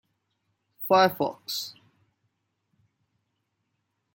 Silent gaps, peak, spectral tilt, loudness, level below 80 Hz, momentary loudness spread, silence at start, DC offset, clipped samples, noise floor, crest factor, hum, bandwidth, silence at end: none; -8 dBFS; -4 dB/octave; -25 LUFS; -78 dBFS; 16 LU; 0.8 s; under 0.1%; under 0.1%; -78 dBFS; 22 dB; none; 17 kHz; 2.45 s